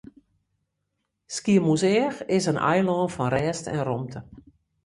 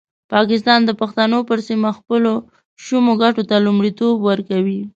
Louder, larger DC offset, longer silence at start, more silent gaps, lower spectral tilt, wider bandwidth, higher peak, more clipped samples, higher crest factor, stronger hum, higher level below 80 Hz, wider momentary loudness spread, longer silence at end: second, -24 LUFS vs -16 LUFS; neither; first, 1.3 s vs 0.3 s; second, none vs 2.65-2.76 s; about the same, -5.5 dB/octave vs -6 dB/octave; first, 11.5 kHz vs 7.6 kHz; second, -8 dBFS vs 0 dBFS; neither; about the same, 18 dB vs 16 dB; neither; first, -56 dBFS vs -62 dBFS; first, 11 LU vs 6 LU; first, 0.45 s vs 0.05 s